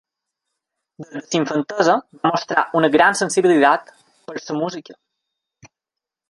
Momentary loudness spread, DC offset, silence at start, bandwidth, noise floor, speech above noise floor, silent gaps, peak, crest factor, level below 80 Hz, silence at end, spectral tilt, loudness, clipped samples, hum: 19 LU; under 0.1%; 1 s; 11.5 kHz; -86 dBFS; 68 dB; none; -2 dBFS; 18 dB; -66 dBFS; 0.65 s; -4 dB/octave; -18 LUFS; under 0.1%; none